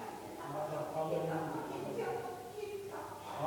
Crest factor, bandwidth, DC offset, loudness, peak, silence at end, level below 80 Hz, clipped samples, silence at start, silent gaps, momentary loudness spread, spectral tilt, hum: 16 dB; 19 kHz; under 0.1%; -41 LUFS; -24 dBFS; 0 s; -72 dBFS; under 0.1%; 0 s; none; 8 LU; -6 dB/octave; none